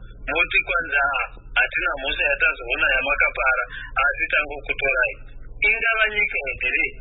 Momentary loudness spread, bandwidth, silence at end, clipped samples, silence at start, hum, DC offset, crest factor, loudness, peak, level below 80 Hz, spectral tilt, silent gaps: 6 LU; 4.1 kHz; 0 s; under 0.1%; 0 s; none; under 0.1%; 16 dB; -20 LUFS; -6 dBFS; -38 dBFS; -7.5 dB/octave; none